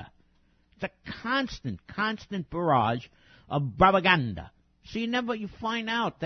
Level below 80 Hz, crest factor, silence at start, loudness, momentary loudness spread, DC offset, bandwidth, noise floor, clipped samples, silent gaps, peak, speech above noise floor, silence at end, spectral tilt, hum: -52 dBFS; 22 dB; 0 s; -28 LUFS; 16 LU; under 0.1%; 6.6 kHz; -65 dBFS; under 0.1%; none; -6 dBFS; 38 dB; 0 s; -6 dB/octave; none